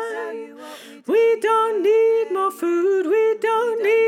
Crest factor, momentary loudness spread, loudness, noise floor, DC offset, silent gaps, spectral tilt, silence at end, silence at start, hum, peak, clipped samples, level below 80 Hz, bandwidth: 10 dB; 17 LU; -19 LUFS; -39 dBFS; under 0.1%; none; -3.5 dB/octave; 0 s; 0 s; none; -8 dBFS; under 0.1%; -88 dBFS; 15 kHz